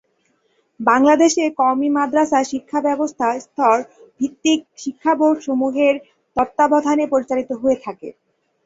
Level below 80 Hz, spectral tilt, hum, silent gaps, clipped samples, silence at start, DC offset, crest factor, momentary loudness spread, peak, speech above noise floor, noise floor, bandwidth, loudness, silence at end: -60 dBFS; -3.5 dB/octave; none; none; under 0.1%; 0.8 s; under 0.1%; 16 dB; 11 LU; -2 dBFS; 47 dB; -64 dBFS; 8 kHz; -18 LUFS; 0.55 s